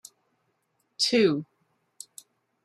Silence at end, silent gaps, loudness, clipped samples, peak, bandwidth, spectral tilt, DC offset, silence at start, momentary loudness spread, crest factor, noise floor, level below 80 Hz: 1.2 s; none; -24 LUFS; under 0.1%; -10 dBFS; 15 kHz; -4 dB/octave; under 0.1%; 1 s; 23 LU; 20 dB; -74 dBFS; -76 dBFS